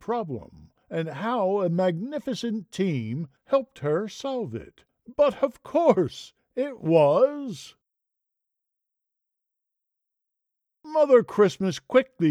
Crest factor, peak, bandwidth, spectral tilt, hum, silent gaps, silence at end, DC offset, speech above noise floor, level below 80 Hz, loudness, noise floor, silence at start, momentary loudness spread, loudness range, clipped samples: 20 dB; -4 dBFS; 11 kHz; -6.5 dB/octave; none; none; 0 s; under 0.1%; 60 dB; -66 dBFS; -25 LUFS; -84 dBFS; 0.1 s; 16 LU; 5 LU; under 0.1%